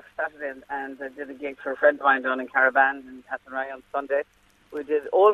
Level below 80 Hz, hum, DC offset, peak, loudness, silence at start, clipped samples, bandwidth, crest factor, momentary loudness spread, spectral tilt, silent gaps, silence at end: -68 dBFS; none; under 0.1%; -6 dBFS; -24 LUFS; 0.2 s; under 0.1%; 6.4 kHz; 20 dB; 17 LU; -5 dB/octave; none; 0 s